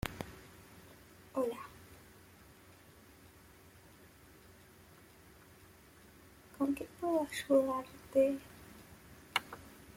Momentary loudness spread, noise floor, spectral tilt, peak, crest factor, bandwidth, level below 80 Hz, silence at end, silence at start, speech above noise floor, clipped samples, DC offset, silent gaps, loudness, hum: 27 LU; -60 dBFS; -5 dB/octave; -16 dBFS; 24 dB; 16.5 kHz; -64 dBFS; 0.05 s; 0.05 s; 26 dB; under 0.1%; under 0.1%; none; -36 LUFS; none